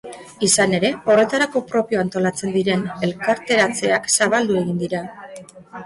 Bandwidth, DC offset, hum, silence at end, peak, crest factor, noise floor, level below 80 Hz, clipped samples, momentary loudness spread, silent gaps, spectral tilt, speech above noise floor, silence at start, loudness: 11.5 kHz; under 0.1%; none; 0 s; -4 dBFS; 16 dB; -39 dBFS; -58 dBFS; under 0.1%; 11 LU; none; -3.5 dB/octave; 20 dB; 0.05 s; -19 LUFS